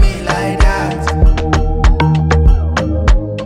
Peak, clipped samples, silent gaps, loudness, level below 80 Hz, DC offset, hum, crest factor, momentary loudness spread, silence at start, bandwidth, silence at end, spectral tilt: 0 dBFS; under 0.1%; none; -14 LUFS; -12 dBFS; under 0.1%; none; 10 dB; 5 LU; 0 s; 10.5 kHz; 0 s; -6.5 dB/octave